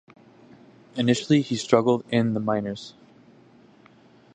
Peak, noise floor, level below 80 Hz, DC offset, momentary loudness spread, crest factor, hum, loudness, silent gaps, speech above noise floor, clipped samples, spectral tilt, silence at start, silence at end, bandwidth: -2 dBFS; -54 dBFS; -64 dBFS; under 0.1%; 16 LU; 24 dB; none; -23 LUFS; none; 31 dB; under 0.1%; -6 dB/octave; 0.95 s; 1.45 s; 9.6 kHz